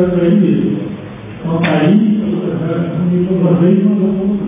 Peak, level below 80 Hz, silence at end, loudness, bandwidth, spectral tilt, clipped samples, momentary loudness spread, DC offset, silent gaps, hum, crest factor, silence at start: 0 dBFS; -44 dBFS; 0 s; -13 LUFS; 3.8 kHz; -12.5 dB/octave; under 0.1%; 10 LU; under 0.1%; none; none; 12 dB; 0 s